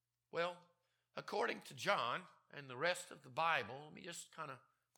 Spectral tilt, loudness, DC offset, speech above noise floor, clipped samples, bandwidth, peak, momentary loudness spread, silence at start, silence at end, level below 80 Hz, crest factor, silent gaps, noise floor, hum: -3 dB/octave; -42 LUFS; under 0.1%; 37 dB; under 0.1%; 17.5 kHz; -20 dBFS; 16 LU; 0.35 s; 0.4 s; under -90 dBFS; 24 dB; none; -80 dBFS; none